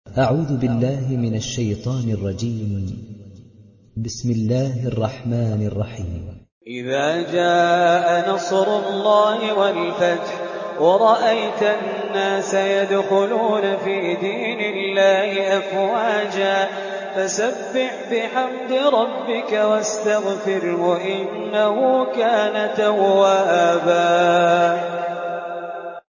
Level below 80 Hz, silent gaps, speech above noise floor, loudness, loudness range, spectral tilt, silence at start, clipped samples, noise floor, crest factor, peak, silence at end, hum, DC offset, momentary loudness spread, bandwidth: -48 dBFS; 6.52-6.61 s; 29 dB; -19 LUFS; 7 LU; -5.5 dB/octave; 0.05 s; under 0.1%; -48 dBFS; 16 dB; -2 dBFS; 0.15 s; none; under 0.1%; 11 LU; 7.4 kHz